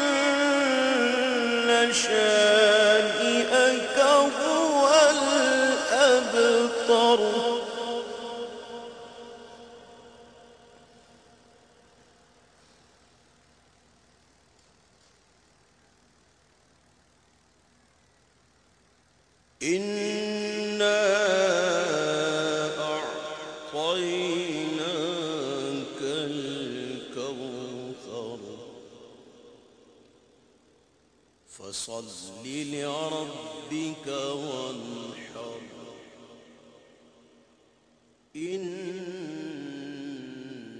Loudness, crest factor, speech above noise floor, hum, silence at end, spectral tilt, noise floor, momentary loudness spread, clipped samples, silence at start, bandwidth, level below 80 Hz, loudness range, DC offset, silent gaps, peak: -25 LUFS; 20 dB; 42 dB; none; 0 s; -2.5 dB/octave; -64 dBFS; 20 LU; under 0.1%; 0 s; 11 kHz; -70 dBFS; 21 LU; under 0.1%; none; -8 dBFS